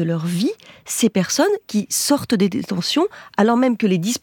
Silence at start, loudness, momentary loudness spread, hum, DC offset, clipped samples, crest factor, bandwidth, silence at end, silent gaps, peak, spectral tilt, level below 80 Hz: 0 s; -19 LUFS; 5 LU; none; under 0.1%; under 0.1%; 18 dB; 19 kHz; 0.05 s; none; -2 dBFS; -4.5 dB/octave; -62 dBFS